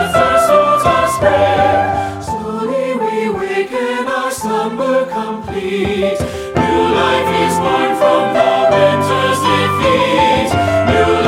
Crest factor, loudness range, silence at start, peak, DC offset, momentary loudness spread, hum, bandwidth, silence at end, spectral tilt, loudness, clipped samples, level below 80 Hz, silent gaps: 14 dB; 5 LU; 0 s; 0 dBFS; under 0.1%; 8 LU; none; 16.5 kHz; 0 s; -5 dB/octave; -14 LUFS; under 0.1%; -38 dBFS; none